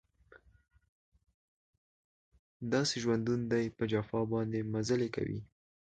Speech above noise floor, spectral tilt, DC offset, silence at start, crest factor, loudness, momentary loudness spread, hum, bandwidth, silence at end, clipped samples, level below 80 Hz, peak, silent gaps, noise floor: 30 dB; -5.5 dB/octave; under 0.1%; 0.35 s; 18 dB; -34 LUFS; 7 LU; none; 9.2 kHz; 0.4 s; under 0.1%; -64 dBFS; -18 dBFS; 0.89-1.12 s, 1.34-2.32 s, 2.39-2.60 s; -63 dBFS